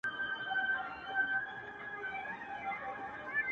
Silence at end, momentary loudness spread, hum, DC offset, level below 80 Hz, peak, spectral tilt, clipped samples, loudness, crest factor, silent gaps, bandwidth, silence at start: 0 s; 9 LU; none; under 0.1%; -72 dBFS; -24 dBFS; -4 dB/octave; under 0.1%; -37 LUFS; 16 dB; none; 8.2 kHz; 0.05 s